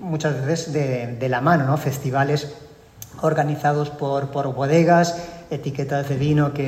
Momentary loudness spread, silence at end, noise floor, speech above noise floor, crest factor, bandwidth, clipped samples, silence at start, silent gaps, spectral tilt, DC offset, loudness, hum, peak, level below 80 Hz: 10 LU; 0 s; -42 dBFS; 22 dB; 16 dB; 16 kHz; under 0.1%; 0 s; none; -6.5 dB/octave; under 0.1%; -21 LUFS; none; -4 dBFS; -52 dBFS